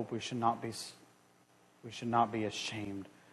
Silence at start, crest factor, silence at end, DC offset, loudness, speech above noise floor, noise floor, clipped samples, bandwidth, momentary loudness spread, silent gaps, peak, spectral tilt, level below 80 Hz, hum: 0 s; 22 dB; 0.25 s; under 0.1%; -36 LUFS; 30 dB; -66 dBFS; under 0.1%; 12 kHz; 16 LU; none; -16 dBFS; -4.5 dB/octave; -74 dBFS; none